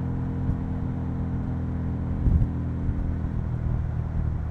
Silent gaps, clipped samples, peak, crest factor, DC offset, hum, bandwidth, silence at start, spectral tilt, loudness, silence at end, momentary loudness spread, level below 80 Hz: none; under 0.1%; -10 dBFS; 16 dB; under 0.1%; none; 3.9 kHz; 0 s; -11 dB/octave; -28 LUFS; 0 s; 5 LU; -30 dBFS